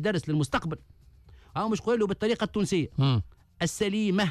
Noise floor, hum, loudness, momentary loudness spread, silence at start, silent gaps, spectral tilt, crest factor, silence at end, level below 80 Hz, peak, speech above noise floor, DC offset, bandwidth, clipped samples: -53 dBFS; none; -28 LUFS; 9 LU; 0 s; none; -6 dB/octave; 14 dB; 0 s; -52 dBFS; -14 dBFS; 26 dB; under 0.1%; 14.5 kHz; under 0.1%